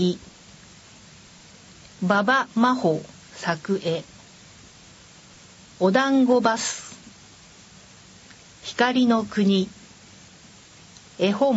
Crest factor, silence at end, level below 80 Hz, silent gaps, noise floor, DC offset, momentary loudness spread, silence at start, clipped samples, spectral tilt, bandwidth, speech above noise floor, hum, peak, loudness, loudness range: 20 dB; 0 s; -62 dBFS; none; -49 dBFS; under 0.1%; 17 LU; 0 s; under 0.1%; -5 dB/octave; 8 kHz; 28 dB; none; -4 dBFS; -22 LUFS; 2 LU